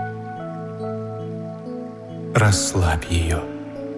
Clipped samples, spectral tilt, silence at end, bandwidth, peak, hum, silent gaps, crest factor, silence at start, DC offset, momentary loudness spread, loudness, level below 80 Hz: under 0.1%; -5 dB/octave; 0 s; 12 kHz; -4 dBFS; none; none; 20 dB; 0 s; under 0.1%; 15 LU; -24 LUFS; -38 dBFS